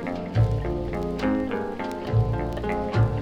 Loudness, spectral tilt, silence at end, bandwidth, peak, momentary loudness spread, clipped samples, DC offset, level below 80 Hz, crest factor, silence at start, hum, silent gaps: -26 LUFS; -8.5 dB/octave; 0 s; 8.2 kHz; -10 dBFS; 5 LU; under 0.1%; under 0.1%; -36 dBFS; 16 dB; 0 s; none; none